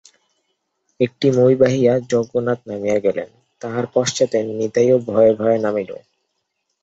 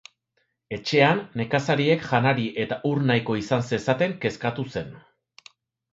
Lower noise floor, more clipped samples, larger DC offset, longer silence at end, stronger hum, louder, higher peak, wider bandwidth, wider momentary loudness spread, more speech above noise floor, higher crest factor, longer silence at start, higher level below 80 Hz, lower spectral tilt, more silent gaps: about the same, -73 dBFS vs -73 dBFS; neither; neither; about the same, 0.85 s vs 0.95 s; neither; first, -18 LUFS vs -24 LUFS; about the same, -2 dBFS vs -4 dBFS; about the same, 8 kHz vs 7.8 kHz; about the same, 12 LU vs 12 LU; first, 56 dB vs 50 dB; second, 16 dB vs 22 dB; first, 1 s vs 0.7 s; about the same, -58 dBFS vs -58 dBFS; about the same, -6 dB/octave vs -6.5 dB/octave; neither